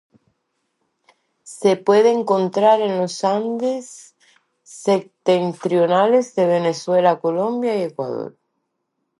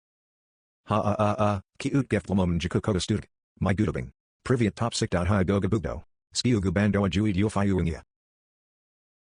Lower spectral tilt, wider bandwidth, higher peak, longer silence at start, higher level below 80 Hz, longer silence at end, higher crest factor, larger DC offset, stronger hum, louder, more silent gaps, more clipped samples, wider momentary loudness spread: about the same, -5.5 dB/octave vs -6 dB/octave; about the same, 11.5 kHz vs 10.5 kHz; first, -2 dBFS vs -10 dBFS; first, 1.45 s vs 0.85 s; second, -74 dBFS vs -48 dBFS; second, 0.9 s vs 1.35 s; about the same, 18 dB vs 18 dB; neither; neither; first, -18 LUFS vs -26 LUFS; second, none vs 3.43-3.55 s, 4.20-4.40 s; neither; first, 11 LU vs 7 LU